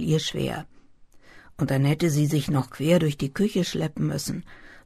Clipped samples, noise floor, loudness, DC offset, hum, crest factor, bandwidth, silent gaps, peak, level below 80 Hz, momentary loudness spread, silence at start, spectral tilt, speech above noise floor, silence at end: under 0.1%; -51 dBFS; -25 LUFS; under 0.1%; none; 18 dB; 13.5 kHz; none; -6 dBFS; -50 dBFS; 9 LU; 0 s; -6 dB/octave; 27 dB; 0.05 s